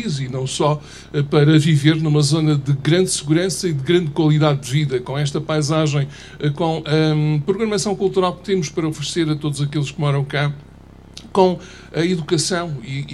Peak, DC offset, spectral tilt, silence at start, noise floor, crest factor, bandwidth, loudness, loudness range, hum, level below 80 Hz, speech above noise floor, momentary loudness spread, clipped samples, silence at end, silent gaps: 0 dBFS; under 0.1%; -5.5 dB/octave; 0 s; -42 dBFS; 18 dB; 12.5 kHz; -19 LUFS; 5 LU; none; -48 dBFS; 24 dB; 8 LU; under 0.1%; 0 s; none